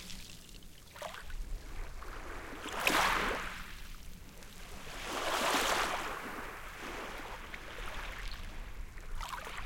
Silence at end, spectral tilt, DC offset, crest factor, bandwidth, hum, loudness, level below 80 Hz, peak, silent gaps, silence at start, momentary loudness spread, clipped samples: 0 s; -2 dB/octave; under 0.1%; 26 dB; 17 kHz; none; -37 LUFS; -46 dBFS; -14 dBFS; none; 0 s; 20 LU; under 0.1%